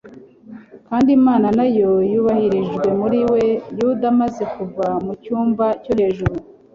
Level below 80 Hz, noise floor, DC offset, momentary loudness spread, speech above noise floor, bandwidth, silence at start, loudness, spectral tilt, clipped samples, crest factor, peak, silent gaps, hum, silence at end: -44 dBFS; -41 dBFS; under 0.1%; 10 LU; 24 dB; 7.2 kHz; 0.05 s; -18 LUFS; -8.5 dB/octave; under 0.1%; 14 dB; -4 dBFS; none; none; 0.3 s